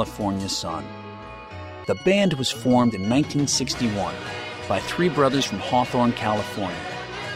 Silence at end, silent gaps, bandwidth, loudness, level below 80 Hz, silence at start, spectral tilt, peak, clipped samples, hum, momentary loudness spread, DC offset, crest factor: 0 s; none; 16 kHz; -23 LUFS; -50 dBFS; 0 s; -4.5 dB/octave; -6 dBFS; under 0.1%; none; 14 LU; under 0.1%; 18 dB